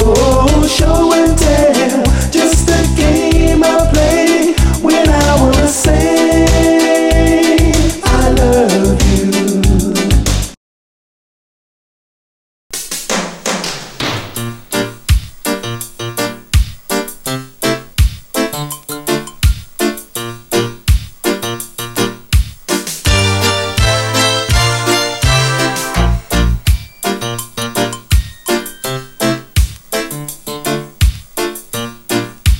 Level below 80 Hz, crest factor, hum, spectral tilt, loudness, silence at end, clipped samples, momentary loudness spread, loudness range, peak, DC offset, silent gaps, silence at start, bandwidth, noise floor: -18 dBFS; 12 dB; none; -4.5 dB/octave; -13 LUFS; 0 s; under 0.1%; 11 LU; 8 LU; 0 dBFS; under 0.1%; 10.57-12.70 s; 0 s; 17 kHz; under -90 dBFS